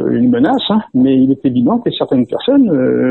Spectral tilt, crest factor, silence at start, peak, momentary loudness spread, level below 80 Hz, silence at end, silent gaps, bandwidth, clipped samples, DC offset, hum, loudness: -9 dB/octave; 10 dB; 0 s; -2 dBFS; 4 LU; -50 dBFS; 0 s; none; 4.2 kHz; under 0.1%; 0.1%; none; -13 LUFS